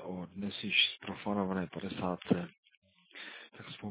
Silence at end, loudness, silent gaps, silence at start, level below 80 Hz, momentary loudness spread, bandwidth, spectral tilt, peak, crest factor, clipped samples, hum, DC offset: 0 s; -33 LUFS; 2.58-2.63 s, 2.77-2.82 s; 0 s; -66 dBFS; 20 LU; 4 kHz; -2.5 dB/octave; -14 dBFS; 22 dB; under 0.1%; none; under 0.1%